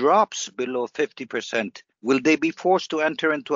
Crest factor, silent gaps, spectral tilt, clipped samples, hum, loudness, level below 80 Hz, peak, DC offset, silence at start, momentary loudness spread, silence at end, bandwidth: 18 dB; none; -2.5 dB/octave; under 0.1%; none; -23 LUFS; -72 dBFS; -6 dBFS; under 0.1%; 0 s; 9 LU; 0 s; 7.6 kHz